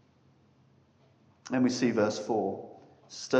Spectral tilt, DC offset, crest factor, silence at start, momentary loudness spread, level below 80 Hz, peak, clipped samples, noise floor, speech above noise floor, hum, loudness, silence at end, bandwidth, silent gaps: -5 dB/octave; under 0.1%; 18 dB; 1.45 s; 21 LU; -80 dBFS; -12 dBFS; under 0.1%; -64 dBFS; 35 dB; none; -30 LUFS; 0 s; 8.6 kHz; none